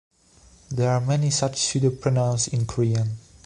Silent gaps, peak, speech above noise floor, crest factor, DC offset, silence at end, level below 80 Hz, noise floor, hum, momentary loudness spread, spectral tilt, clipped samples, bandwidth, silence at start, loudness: none; -8 dBFS; 32 dB; 16 dB; under 0.1%; 0.25 s; -50 dBFS; -54 dBFS; none; 4 LU; -5 dB/octave; under 0.1%; 11 kHz; 0.7 s; -23 LUFS